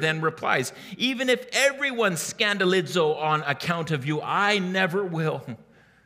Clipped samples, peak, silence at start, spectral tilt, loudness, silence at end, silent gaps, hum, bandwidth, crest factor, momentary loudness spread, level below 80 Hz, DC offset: under 0.1%; -6 dBFS; 0 s; -4 dB/octave; -24 LUFS; 0.45 s; none; none; 16 kHz; 20 dB; 6 LU; -70 dBFS; under 0.1%